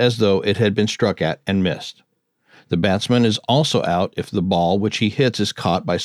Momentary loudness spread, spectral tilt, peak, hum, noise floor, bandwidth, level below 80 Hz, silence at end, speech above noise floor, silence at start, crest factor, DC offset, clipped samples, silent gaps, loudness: 6 LU; -5.5 dB/octave; -4 dBFS; none; -59 dBFS; 13 kHz; -54 dBFS; 0 s; 40 dB; 0 s; 16 dB; under 0.1%; under 0.1%; none; -19 LUFS